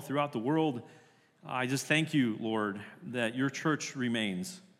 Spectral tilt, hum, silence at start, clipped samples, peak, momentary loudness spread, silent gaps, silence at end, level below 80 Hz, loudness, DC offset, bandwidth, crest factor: -5 dB/octave; none; 0 s; under 0.1%; -14 dBFS; 11 LU; none; 0.2 s; -88 dBFS; -32 LUFS; under 0.1%; 15.5 kHz; 20 dB